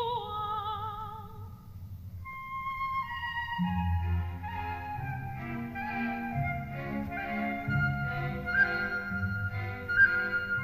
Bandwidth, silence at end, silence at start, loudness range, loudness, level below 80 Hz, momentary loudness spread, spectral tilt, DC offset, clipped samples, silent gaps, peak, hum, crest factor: 15.5 kHz; 0 s; 0 s; 7 LU; -32 LUFS; -48 dBFS; 16 LU; -7.5 dB/octave; under 0.1%; under 0.1%; none; -12 dBFS; none; 20 dB